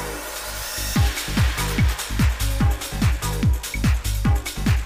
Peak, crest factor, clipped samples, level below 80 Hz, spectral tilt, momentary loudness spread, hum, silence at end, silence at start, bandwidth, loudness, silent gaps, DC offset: -10 dBFS; 12 dB; under 0.1%; -24 dBFS; -4.5 dB/octave; 5 LU; 50 Hz at -35 dBFS; 0 s; 0 s; 16 kHz; -23 LUFS; none; under 0.1%